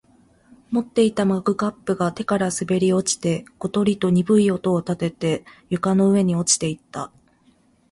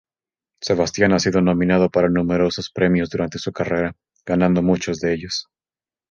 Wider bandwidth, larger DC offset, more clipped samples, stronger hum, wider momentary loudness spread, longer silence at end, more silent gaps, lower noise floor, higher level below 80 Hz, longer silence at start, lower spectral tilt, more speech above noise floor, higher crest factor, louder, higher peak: first, 11.5 kHz vs 7.4 kHz; neither; neither; neither; about the same, 9 LU vs 9 LU; first, 0.85 s vs 0.7 s; neither; second, -58 dBFS vs under -90 dBFS; second, -56 dBFS vs -44 dBFS; about the same, 0.7 s vs 0.6 s; about the same, -5 dB/octave vs -6 dB/octave; second, 38 dB vs over 71 dB; about the same, 16 dB vs 18 dB; about the same, -21 LUFS vs -19 LUFS; about the same, -4 dBFS vs -2 dBFS